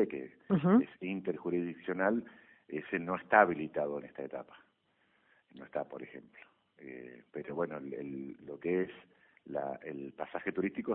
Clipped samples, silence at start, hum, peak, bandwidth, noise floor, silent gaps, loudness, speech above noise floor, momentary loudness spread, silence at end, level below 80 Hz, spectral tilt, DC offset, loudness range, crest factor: under 0.1%; 0 s; none; -8 dBFS; 4 kHz; -74 dBFS; none; -35 LUFS; 39 dB; 21 LU; 0 s; -74 dBFS; -6.5 dB/octave; under 0.1%; 12 LU; 26 dB